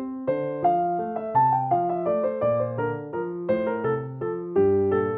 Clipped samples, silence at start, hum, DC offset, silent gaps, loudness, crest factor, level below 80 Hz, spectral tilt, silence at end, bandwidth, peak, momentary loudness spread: under 0.1%; 0 s; none; under 0.1%; none; -25 LUFS; 14 dB; -60 dBFS; -11.5 dB/octave; 0 s; 4 kHz; -10 dBFS; 8 LU